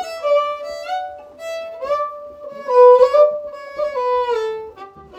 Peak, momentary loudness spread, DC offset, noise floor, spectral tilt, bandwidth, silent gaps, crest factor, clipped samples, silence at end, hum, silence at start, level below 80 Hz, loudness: 0 dBFS; 21 LU; under 0.1%; -38 dBFS; -2.5 dB/octave; 8.4 kHz; none; 18 dB; under 0.1%; 0 s; none; 0 s; -58 dBFS; -16 LUFS